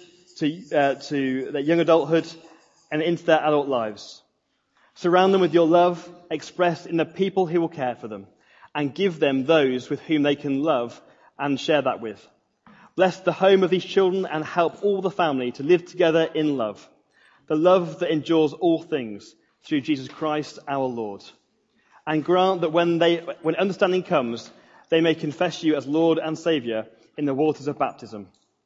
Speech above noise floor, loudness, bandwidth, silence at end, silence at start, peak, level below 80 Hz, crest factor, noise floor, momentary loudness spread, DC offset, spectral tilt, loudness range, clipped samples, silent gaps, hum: 50 dB; -23 LUFS; 7.8 kHz; 0.4 s; 0.35 s; -4 dBFS; -74 dBFS; 20 dB; -72 dBFS; 13 LU; under 0.1%; -6 dB/octave; 4 LU; under 0.1%; none; none